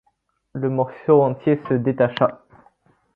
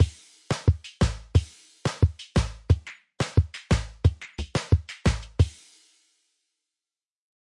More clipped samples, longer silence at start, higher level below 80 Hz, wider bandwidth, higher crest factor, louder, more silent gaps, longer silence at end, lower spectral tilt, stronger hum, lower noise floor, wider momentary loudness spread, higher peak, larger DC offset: neither; first, 0.55 s vs 0 s; second, -60 dBFS vs -34 dBFS; second, 5 kHz vs 11.5 kHz; about the same, 18 dB vs 18 dB; first, -20 LUFS vs -27 LUFS; neither; second, 0.8 s vs 2 s; first, -10 dB/octave vs -6 dB/octave; neither; second, -68 dBFS vs under -90 dBFS; about the same, 8 LU vs 8 LU; first, -2 dBFS vs -8 dBFS; neither